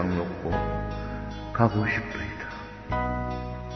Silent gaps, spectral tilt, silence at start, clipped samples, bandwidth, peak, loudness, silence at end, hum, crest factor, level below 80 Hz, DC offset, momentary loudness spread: none; -8 dB/octave; 0 s; under 0.1%; 6.4 kHz; -6 dBFS; -29 LUFS; 0 s; none; 22 dB; -38 dBFS; under 0.1%; 11 LU